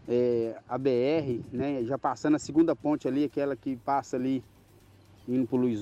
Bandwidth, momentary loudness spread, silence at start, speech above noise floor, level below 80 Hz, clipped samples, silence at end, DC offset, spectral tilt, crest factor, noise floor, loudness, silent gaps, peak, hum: 9 kHz; 7 LU; 0.05 s; 29 dB; -64 dBFS; under 0.1%; 0 s; under 0.1%; -7 dB/octave; 14 dB; -57 dBFS; -29 LUFS; none; -14 dBFS; none